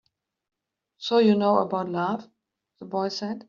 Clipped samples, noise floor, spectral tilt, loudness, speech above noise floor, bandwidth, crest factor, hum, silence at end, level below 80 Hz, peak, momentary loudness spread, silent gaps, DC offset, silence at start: under 0.1%; -66 dBFS; -5 dB/octave; -24 LUFS; 42 dB; 7.2 kHz; 18 dB; none; 0.05 s; -72 dBFS; -8 dBFS; 13 LU; none; under 0.1%; 1 s